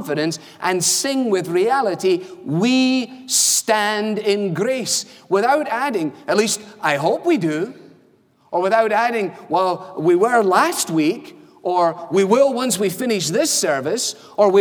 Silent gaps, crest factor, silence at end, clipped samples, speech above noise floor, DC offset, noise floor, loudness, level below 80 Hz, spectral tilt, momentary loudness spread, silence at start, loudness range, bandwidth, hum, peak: none; 18 dB; 0 s; under 0.1%; 37 dB; under 0.1%; -56 dBFS; -18 LUFS; -74 dBFS; -3 dB/octave; 7 LU; 0 s; 3 LU; over 20 kHz; none; -2 dBFS